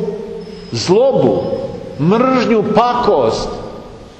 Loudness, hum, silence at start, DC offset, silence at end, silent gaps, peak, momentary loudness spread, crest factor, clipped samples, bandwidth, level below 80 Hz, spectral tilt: -14 LUFS; none; 0 s; under 0.1%; 0.05 s; none; 0 dBFS; 16 LU; 14 dB; under 0.1%; 8.8 kHz; -40 dBFS; -6 dB/octave